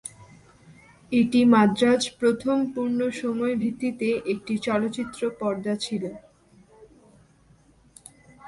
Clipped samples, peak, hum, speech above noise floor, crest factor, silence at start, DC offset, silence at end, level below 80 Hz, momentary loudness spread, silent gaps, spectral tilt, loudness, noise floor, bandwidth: under 0.1%; -6 dBFS; none; 34 dB; 18 dB; 0.05 s; under 0.1%; 0 s; -62 dBFS; 11 LU; none; -5.5 dB/octave; -24 LUFS; -58 dBFS; 11.5 kHz